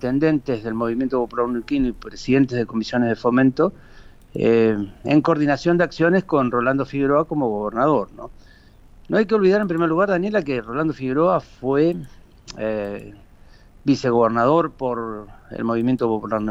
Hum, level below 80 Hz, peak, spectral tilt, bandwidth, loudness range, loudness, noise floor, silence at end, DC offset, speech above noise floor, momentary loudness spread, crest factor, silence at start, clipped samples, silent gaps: none; -46 dBFS; -4 dBFS; -7.5 dB/octave; 7.8 kHz; 3 LU; -20 LUFS; -47 dBFS; 0 s; under 0.1%; 28 dB; 10 LU; 16 dB; 0 s; under 0.1%; none